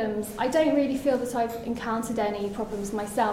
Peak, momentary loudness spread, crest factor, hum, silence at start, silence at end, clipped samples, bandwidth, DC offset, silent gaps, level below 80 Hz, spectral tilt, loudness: -12 dBFS; 8 LU; 14 dB; none; 0 s; 0 s; under 0.1%; 16 kHz; under 0.1%; none; -52 dBFS; -5 dB/octave; -27 LUFS